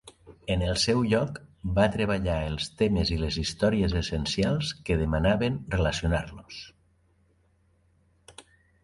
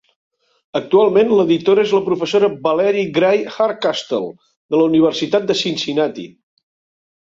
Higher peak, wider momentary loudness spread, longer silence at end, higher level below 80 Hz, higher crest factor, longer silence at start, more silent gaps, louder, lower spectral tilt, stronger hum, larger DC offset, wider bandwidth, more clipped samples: second, -8 dBFS vs -2 dBFS; about the same, 11 LU vs 10 LU; second, 0.45 s vs 0.9 s; first, -38 dBFS vs -62 dBFS; first, 20 dB vs 14 dB; second, 0.05 s vs 0.75 s; second, none vs 4.56-4.69 s; second, -27 LUFS vs -16 LUFS; about the same, -5.5 dB/octave vs -5.5 dB/octave; neither; neither; first, 11.5 kHz vs 7.6 kHz; neither